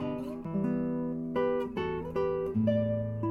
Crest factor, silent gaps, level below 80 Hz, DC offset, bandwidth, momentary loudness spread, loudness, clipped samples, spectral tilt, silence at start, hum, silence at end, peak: 16 dB; none; -56 dBFS; under 0.1%; 6.2 kHz; 6 LU; -32 LUFS; under 0.1%; -9.5 dB/octave; 0 s; none; 0 s; -16 dBFS